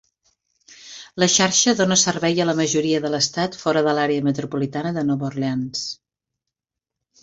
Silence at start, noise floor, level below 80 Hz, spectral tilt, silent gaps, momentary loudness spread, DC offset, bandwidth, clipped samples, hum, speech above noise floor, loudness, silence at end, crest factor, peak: 0.85 s; -86 dBFS; -60 dBFS; -3.5 dB/octave; none; 12 LU; under 0.1%; 8 kHz; under 0.1%; none; 66 dB; -20 LUFS; 1.3 s; 20 dB; -2 dBFS